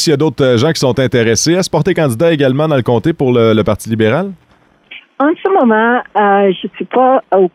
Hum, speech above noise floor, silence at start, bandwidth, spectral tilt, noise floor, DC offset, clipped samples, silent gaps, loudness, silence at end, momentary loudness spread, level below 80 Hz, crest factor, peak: none; 29 dB; 0 s; 15.5 kHz; -5.5 dB/octave; -40 dBFS; under 0.1%; under 0.1%; none; -12 LUFS; 0.05 s; 5 LU; -44 dBFS; 10 dB; -2 dBFS